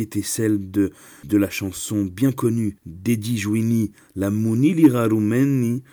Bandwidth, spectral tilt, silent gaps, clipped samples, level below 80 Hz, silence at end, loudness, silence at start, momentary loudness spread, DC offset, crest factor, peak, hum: over 20 kHz; -6.5 dB/octave; none; under 0.1%; -56 dBFS; 0.1 s; -21 LUFS; 0 s; 9 LU; under 0.1%; 18 dB; -4 dBFS; none